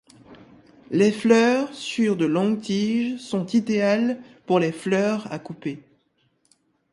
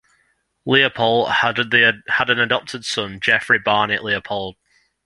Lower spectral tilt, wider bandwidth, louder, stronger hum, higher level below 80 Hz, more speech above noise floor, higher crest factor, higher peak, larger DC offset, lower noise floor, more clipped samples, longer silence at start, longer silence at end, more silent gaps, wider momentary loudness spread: first, -6 dB/octave vs -3.5 dB/octave; about the same, 11.5 kHz vs 11.5 kHz; second, -22 LUFS vs -17 LUFS; neither; second, -68 dBFS vs -56 dBFS; about the same, 45 dB vs 46 dB; about the same, 20 dB vs 20 dB; second, -4 dBFS vs 0 dBFS; neither; about the same, -67 dBFS vs -65 dBFS; neither; second, 0.3 s vs 0.65 s; first, 1.15 s vs 0.55 s; neither; first, 15 LU vs 10 LU